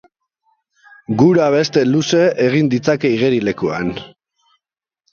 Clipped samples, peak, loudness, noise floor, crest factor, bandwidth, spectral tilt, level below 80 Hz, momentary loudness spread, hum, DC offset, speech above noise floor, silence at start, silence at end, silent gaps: under 0.1%; 0 dBFS; -15 LUFS; -83 dBFS; 16 dB; 7.2 kHz; -6 dB/octave; -54 dBFS; 11 LU; none; under 0.1%; 68 dB; 1.1 s; 1.05 s; none